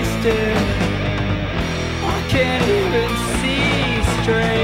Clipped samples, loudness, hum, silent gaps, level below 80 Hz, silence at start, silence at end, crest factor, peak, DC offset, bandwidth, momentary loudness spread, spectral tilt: under 0.1%; -18 LUFS; none; none; -28 dBFS; 0 s; 0 s; 14 dB; -4 dBFS; under 0.1%; 16 kHz; 5 LU; -5.5 dB/octave